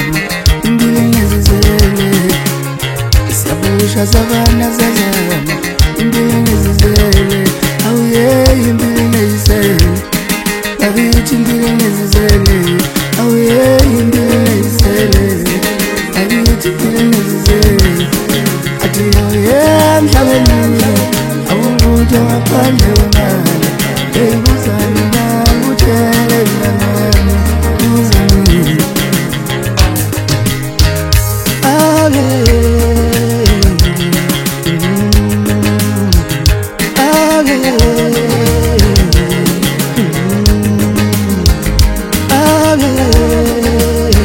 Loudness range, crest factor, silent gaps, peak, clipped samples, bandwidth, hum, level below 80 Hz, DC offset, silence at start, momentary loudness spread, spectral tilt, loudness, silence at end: 2 LU; 10 dB; none; 0 dBFS; 0.8%; over 20 kHz; none; -16 dBFS; under 0.1%; 0 s; 5 LU; -5 dB/octave; -10 LUFS; 0 s